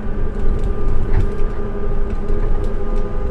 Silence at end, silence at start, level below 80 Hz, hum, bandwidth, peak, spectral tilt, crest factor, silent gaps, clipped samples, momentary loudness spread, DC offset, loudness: 0 s; 0 s; -16 dBFS; none; 3.2 kHz; -2 dBFS; -9 dB/octave; 12 dB; none; under 0.1%; 4 LU; under 0.1%; -24 LUFS